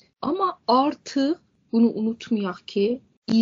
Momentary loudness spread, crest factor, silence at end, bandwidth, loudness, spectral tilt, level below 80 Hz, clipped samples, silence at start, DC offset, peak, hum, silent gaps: 7 LU; 16 dB; 0 s; 7.6 kHz; -24 LUFS; -5 dB/octave; -68 dBFS; under 0.1%; 0.2 s; under 0.1%; -6 dBFS; none; 3.17-3.22 s